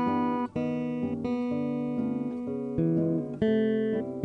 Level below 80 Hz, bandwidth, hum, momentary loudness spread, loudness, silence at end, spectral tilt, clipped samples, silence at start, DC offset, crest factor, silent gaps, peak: -58 dBFS; 6 kHz; none; 5 LU; -29 LUFS; 0 s; -9.5 dB/octave; under 0.1%; 0 s; under 0.1%; 16 dB; none; -12 dBFS